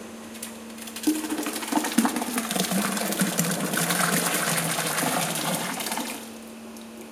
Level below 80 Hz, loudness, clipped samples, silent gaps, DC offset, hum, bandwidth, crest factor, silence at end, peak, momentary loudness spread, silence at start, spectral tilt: -68 dBFS; -25 LUFS; under 0.1%; none; under 0.1%; none; 17 kHz; 22 dB; 0 s; -4 dBFS; 15 LU; 0 s; -3 dB/octave